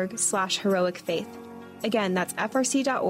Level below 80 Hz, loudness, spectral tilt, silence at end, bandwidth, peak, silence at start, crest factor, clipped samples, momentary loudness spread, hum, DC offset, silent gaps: -70 dBFS; -26 LUFS; -3.5 dB/octave; 0 s; 16 kHz; -14 dBFS; 0 s; 14 dB; under 0.1%; 12 LU; none; under 0.1%; none